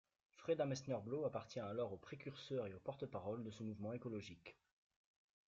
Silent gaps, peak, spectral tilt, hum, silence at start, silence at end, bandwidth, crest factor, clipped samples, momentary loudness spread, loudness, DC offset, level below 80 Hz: none; -30 dBFS; -6 dB/octave; none; 0.35 s; 0.95 s; 7.6 kHz; 18 dB; under 0.1%; 11 LU; -47 LUFS; under 0.1%; -80 dBFS